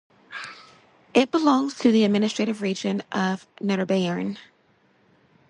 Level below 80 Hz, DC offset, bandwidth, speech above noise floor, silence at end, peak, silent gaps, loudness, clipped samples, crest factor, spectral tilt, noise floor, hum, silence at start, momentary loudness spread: -68 dBFS; under 0.1%; 10.5 kHz; 39 dB; 1.05 s; -6 dBFS; none; -23 LUFS; under 0.1%; 20 dB; -5.5 dB/octave; -62 dBFS; none; 0.3 s; 17 LU